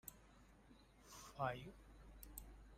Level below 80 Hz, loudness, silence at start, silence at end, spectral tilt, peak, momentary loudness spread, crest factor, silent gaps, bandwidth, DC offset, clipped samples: -64 dBFS; -52 LUFS; 0.05 s; 0 s; -4.5 dB/octave; -28 dBFS; 22 LU; 26 dB; none; 16 kHz; under 0.1%; under 0.1%